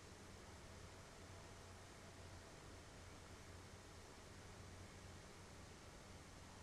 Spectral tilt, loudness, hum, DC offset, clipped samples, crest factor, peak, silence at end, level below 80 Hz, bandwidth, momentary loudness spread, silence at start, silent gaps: -4 dB/octave; -59 LUFS; none; under 0.1%; under 0.1%; 12 dB; -46 dBFS; 0 s; -68 dBFS; 13.5 kHz; 1 LU; 0 s; none